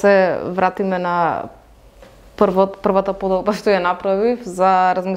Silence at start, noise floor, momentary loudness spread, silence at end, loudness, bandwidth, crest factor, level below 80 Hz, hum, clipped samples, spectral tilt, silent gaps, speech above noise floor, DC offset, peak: 0 s; -45 dBFS; 6 LU; 0 s; -18 LUFS; 14.5 kHz; 18 dB; -48 dBFS; none; under 0.1%; -6.5 dB/octave; none; 28 dB; under 0.1%; 0 dBFS